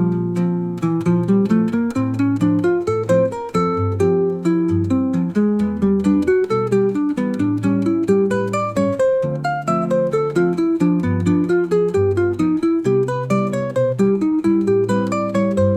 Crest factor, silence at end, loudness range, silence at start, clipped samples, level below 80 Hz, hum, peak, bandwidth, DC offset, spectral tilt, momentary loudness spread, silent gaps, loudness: 12 dB; 0 s; 1 LU; 0 s; under 0.1%; -52 dBFS; none; -6 dBFS; 10.5 kHz; 0.1%; -8.5 dB/octave; 3 LU; none; -18 LUFS